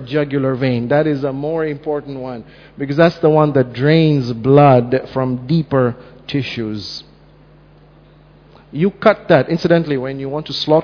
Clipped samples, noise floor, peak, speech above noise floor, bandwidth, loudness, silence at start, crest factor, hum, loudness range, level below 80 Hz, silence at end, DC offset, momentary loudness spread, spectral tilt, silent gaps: under 0.1%; -45 dBFS; 0 dBFS; 30 dB; 5.4 kHz; -16 LUFS; 0 s; 16 dB; none; 8 LU; -48 dBFS; 0 s; under 0.1%; 14 LU; -8 dB/octave; none